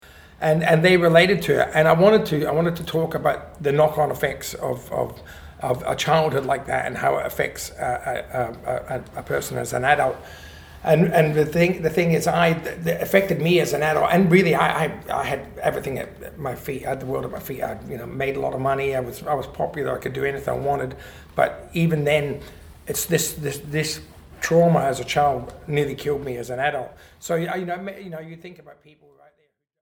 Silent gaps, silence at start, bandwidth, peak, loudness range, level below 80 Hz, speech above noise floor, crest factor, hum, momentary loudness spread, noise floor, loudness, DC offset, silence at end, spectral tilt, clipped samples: none; 0.1 s; over 20 kHz; -2 dBFS; 8 LU; -48 dBFS; 46 dB; 20 dB; none; 14 LU; -68 dBFS; -22 LUFS; under 0.1%; 1.1 s; -5.5 dB/octave; under 0.1%